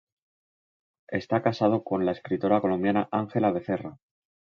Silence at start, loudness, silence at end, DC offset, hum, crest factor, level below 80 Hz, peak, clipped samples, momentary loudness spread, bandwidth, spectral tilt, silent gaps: 1.1 s; -26 LUFS; 0.65 s; under 0.1%; none; 20 dB; -62 dBFS; -8 dBFS; under 0.1%; 9 LU; 6.8 kHz; -8.5 dB/octave; none